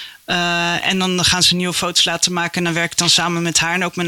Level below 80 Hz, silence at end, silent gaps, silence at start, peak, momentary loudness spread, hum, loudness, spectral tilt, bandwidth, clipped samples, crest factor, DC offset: -48 dBFS; 0 s; none; 0 s; -2 dBFS; 6 LU; none; -15 LUFS; -2.5 dB/octave; 17 kHz; under 0.1%; 16 dB; under 0.1%